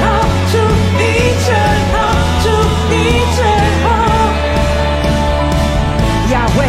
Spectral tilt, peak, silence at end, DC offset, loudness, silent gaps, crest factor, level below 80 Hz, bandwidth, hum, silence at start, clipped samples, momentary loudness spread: -5.5 dB/octave; 0 dBFS; 0 s; under 0.1%; -12 LUFS; none; 12 dB; -18 dBFS; 15 kHz; none; 0 s; under 0.1%; 2 LU